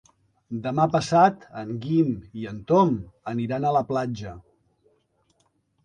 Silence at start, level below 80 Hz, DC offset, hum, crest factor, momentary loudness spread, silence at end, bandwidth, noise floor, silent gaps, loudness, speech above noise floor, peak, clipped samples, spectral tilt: 0.5 s; -56 dBFS; under 0.1%; none; 20 dB; 16 LU; 1.45 s; 10.5 kHz; -68 dBFS; none; -24 LUFS; 45 dB; -4 dBFS; under 0.1%; -7 dB/octave